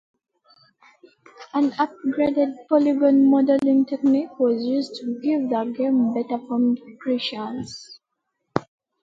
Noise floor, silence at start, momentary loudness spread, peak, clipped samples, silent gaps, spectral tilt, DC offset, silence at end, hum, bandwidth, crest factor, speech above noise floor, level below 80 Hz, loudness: -78 dBFS; 1.4 s; 13 LU; 0 dBFS; under 0.1%; none; -6.5 dB/octave; under 0.1%; 0.4 s; none; 7.6 kHz; 22 dB; 57 dB; -66 dBFS; -22 LUFS